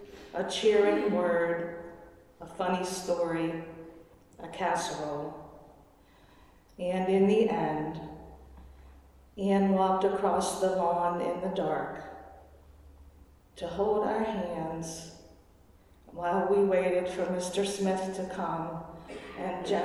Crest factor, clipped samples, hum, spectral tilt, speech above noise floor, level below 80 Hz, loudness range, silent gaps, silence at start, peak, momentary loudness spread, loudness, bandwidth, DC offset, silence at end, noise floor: 18 dB; under 0.1%; none; -5.5 dB/octave; 30 dB; -58 dBFS; 6 LU; none; 0 s; -14 dBFS; 20 LU; -30 LUFS; 13.5 kHz; under 0.1%; 0 s; -59 dBFS